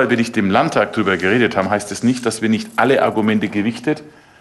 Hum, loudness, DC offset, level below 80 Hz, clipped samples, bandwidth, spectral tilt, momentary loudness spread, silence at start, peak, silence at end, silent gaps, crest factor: none; -17 LUFS; under 0.1%; -50 dBFS; under 0.1%; 12.5 kHz; -5.5 dB/octave; 5 LU; 0 s; -2 dBFS; 0.3 s; none; 14 dB